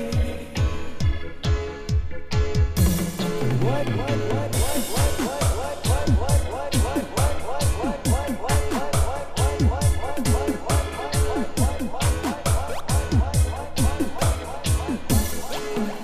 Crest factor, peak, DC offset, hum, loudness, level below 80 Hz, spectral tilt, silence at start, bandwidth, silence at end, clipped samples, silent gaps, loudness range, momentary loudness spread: 14 dB; -8 dBFS; under 0.1%; none; -24 LUFS; -28 dBFS; -5 dB/octave; 0 s; 16 kHz; 0 s; under 0.1%; none; 1 LU; 5 LU